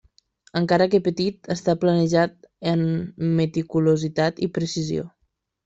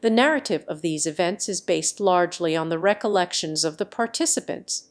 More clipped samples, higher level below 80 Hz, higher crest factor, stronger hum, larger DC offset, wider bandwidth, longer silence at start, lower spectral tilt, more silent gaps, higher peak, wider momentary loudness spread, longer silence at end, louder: neither; first, -58 dBFS vs -72 dBFS; about the same, 16 dB vs 20 dB; neither; neither; second, 7.8 kHz vs 11 kHz; first, 0.55 s vs 0 s; first, -6.5 dB/octave vs -3 dB/octave; neither; about the same, -6 dBFS vs -4 dBFS; about the same, 8 LU vs 7 LU; first, 0.6 s vs 0.1 s; about the same, -22 LUFS vs -23 LUFS